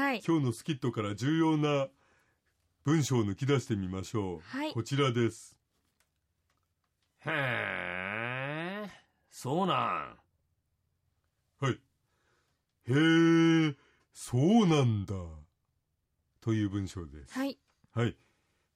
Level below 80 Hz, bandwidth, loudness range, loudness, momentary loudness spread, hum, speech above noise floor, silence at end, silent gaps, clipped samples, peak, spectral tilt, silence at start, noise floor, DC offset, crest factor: -66 dBFS; 14 kHz; 9 LU; -31 LUFS; 16 LU; none; 50 dB; 0.6 s; none; under 0.1%; -14 dBFS; -6 dB/octave; 0 s; -80 dBFS; under 0.1%; 18 dB